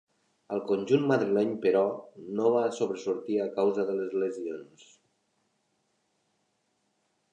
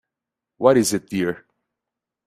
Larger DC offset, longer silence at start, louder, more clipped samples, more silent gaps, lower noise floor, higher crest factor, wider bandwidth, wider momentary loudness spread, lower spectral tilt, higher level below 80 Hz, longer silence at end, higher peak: neither; about the same, 0.5 s vs 0.6 s; second, -28 LUFS vs -20 LUFS; neither; neither; second, -75 dBFS vs -86 dBFS; about the same, 18 dB vs 22 dB; second, 9.4 kHz vs 15 kHz; about the same, 11 LU vs 10 LU; first, -6.5 dB/octave vs -4.5 dB/octave; second, -78 dBFS vs -62 dBFS; first, 2.7 s vs 0.9 s; second, -12 dBFS vs -2 dBFS